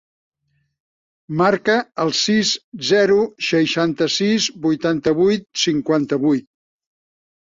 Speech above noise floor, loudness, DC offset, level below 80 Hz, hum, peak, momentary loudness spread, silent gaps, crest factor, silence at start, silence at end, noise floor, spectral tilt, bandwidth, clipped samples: 51 dB; -18 LUFS; under 0.1%; -60 dBFS; none; -4 dBFS; 4 LU; 2.64-2.72 s; 16 dB; 1.3 s; 1.1 s; -69 dBFS; -4 dB/octave; 7.8 kHz; under 0.1%